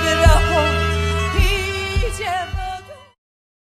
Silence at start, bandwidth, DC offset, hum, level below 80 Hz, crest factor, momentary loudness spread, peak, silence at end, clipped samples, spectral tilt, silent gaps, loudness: 0 s; 14 kHz; under 0.1%; none; -22 dBFS; 18 dB; 13 LU; 0 dBFS; 0.7 s; under 0.1%; -4.5 dB/octave; none; -18 LUFS